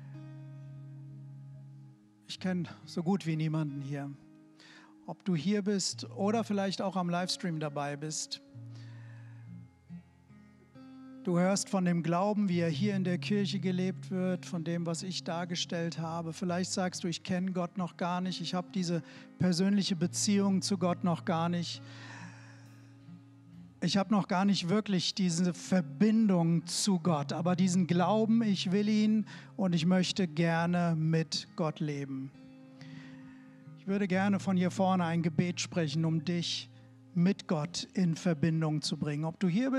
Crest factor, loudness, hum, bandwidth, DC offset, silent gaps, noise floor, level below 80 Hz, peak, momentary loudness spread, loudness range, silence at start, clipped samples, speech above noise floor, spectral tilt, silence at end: 16 dB; -31 LUFS; none; 12 kHz; under 0.1%; none; -58 dBFS; -78 dBFS; -16 dBFS; 20 LU; 7 LU; 0 s; under 0.1%; 27 dB; -5.5 dB/octave; 0 s